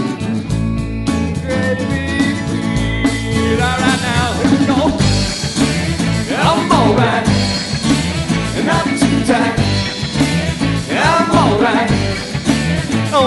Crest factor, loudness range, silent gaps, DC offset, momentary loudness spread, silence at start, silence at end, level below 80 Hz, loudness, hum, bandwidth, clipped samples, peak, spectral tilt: 14 dB; 2 LU; none; under 0.1%; 6 LU; 0 s; 0 s; -30 dBFS; -15 LUFS; none; 12 kHz; under 0.1%; 0 dBFS; -5 dB/octave